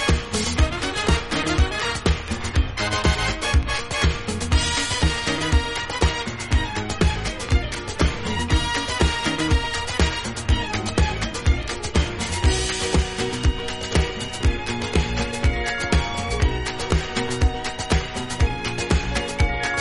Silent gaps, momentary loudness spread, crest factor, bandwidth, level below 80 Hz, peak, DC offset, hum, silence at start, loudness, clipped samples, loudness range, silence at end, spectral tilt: none; 4 LU; 20 dB; 11.5 kHz; -26 dBFS; -2 dBFS; under 0.1%; none; 0 s; -23 LUFS; under 0.1%; 2 LU; 0 s; -4 dB/octave